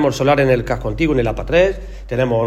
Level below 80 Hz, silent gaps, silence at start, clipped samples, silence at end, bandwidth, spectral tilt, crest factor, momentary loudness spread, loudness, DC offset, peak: -30 dBFS; none; 0 s; under 0.1%; 0 s; 13.5 kHz; -6.5 dB/octave; 14 dB; 8 LU; -17 LUFS; under 0.1%; -2 dBFS